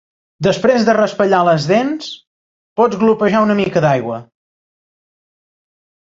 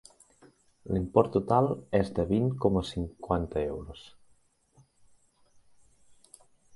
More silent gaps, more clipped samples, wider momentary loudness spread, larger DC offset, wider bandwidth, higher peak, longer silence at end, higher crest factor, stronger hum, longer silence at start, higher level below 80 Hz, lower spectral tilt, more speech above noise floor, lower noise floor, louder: first, 2.27-2.76 s vs none; neither; about the same, 13 LU vs 11 LU; neither; second, 7.8 kHz vs 11.5 kHz; first, 0 dBFS vs -6 dBFS; second, 1.9 s vs 2.7 s; second, 16 dB vs 26 dB; neither; second, 0.4 s vs 0.85 s; second, -54 dBFS vs -48 dBFS; second, -6.5 dB/octave vs -8 dB/octave; first, over 76 dB vs 37 dB; first, under -90 dBFS vs -65 dBFS; first, -14 LUFS vs -29 LUFS